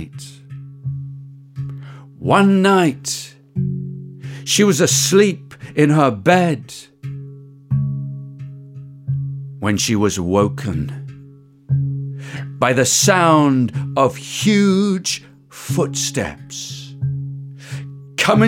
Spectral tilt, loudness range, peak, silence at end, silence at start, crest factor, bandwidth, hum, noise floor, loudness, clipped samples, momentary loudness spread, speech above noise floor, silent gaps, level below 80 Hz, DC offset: -4.5 dB/octave; 7 LU; -2 dBFS; 0 s; 0 s; 18 dB; 16.5 kHz; none; -43 dBFS; -17 LUFS; under 0.1%; 21 LU; 27 dB; none; -52 dBFS; under 0.1%